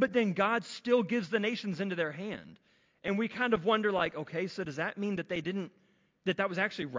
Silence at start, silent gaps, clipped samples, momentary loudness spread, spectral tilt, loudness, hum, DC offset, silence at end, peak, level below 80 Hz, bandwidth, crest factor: 0 s; none; under 0.1%; 10 LU; -6 dB/octave; -32 LUFS; none; under 0.1%; 0 s; -14 dBFS; -70 dBFS; 7.6 kHz; 18 dB